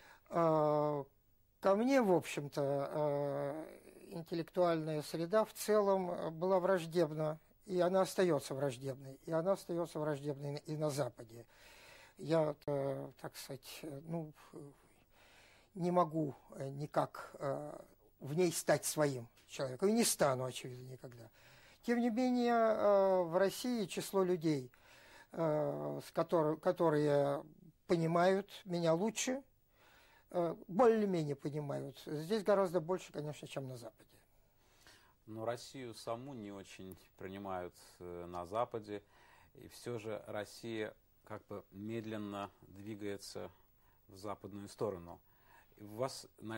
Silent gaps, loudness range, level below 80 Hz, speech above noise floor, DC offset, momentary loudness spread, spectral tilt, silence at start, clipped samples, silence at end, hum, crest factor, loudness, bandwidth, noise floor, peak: none; 12 LU; -74 dBFS; 34 dB; under 0.1%; 19 LU; -5.5 dB/octave; 0.05 s; under 0.1%; 0 s; none; 20 dB; -37 LUFS; 16 kHz; -71 dBFS; -18 dBFS